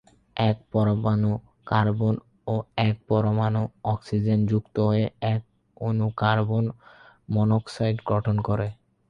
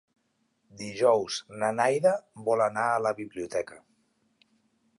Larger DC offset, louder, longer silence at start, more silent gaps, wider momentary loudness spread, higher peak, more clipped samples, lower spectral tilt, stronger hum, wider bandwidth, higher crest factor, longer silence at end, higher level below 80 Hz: neither; about the same, -25 LUFS vs -27 LUFS; second, 0.35 s vs 0.75 s; neither; second, 7 LU vs 11 LU; first, -6 dBFS vs -10 dBFS; neither; first, -8.5 dB/octave vs -4 dB/octave; neither; second, 6.8 kHz vs 11.5 kHz; about the same, 20 dB vs 20 dB; second, 0.35 s vs 1.2 s; first, -52 dBFS vs -72 dBFS